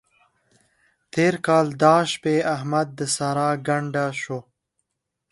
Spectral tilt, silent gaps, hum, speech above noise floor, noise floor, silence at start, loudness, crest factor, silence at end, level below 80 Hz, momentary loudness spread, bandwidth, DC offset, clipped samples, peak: -5 dB/octave; none; none; 59 dB; -80 dBFS; 1.15 s; -22 LUFS; 20 dB; 0.9 s; -66 dBFS; 11 LU; 11.5 kHz; under 0.1%; under 0.1%; -2 dBFS